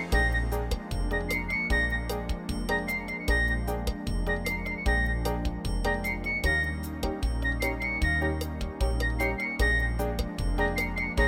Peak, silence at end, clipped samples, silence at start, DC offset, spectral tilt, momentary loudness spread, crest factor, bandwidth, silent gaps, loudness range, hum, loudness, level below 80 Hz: -12 dBFS; 0 s; under 0.1%; 0 s; under 0.1%; -5.5 dB/octave; 7 LU; 16 dB; 16.5 kHz; none; 1 LU; none; -29 LUFS; -32 dBFS